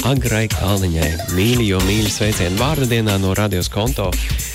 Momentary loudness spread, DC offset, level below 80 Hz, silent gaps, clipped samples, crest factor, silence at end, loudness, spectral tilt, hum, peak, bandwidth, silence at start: 4 LU; under 0.1%; -28 dBFS; none; under 0.1%; 10 dB; 0 s; -17 LUFS; -5 dB/octave; none; -8 dBFS; 16.5 kHz; 0 s